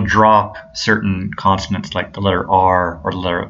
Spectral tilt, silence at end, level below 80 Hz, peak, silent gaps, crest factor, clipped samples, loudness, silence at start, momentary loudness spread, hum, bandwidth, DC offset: -5.5 dB/octave; 0 s; -40 dBFS; 0 dBFS; none; 16 dB; under 0.1%; -16 LUFS; 0 s; 10 LU; none; 7.8 kHz; under 0.1%